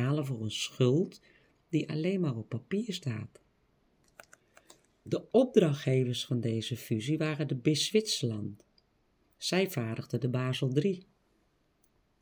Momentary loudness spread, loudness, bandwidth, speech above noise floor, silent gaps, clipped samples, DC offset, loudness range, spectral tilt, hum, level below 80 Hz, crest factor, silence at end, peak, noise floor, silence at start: 10 LU; -31 LUFS; over 20 kHz; 41 dB; none; under 0.1%; under 0.1%; 6 LU; -5.5 dB/octave; none; -74 dBFS; 22 dB; 1.2 s; -10 dBFS; -72 dBFS; 0 s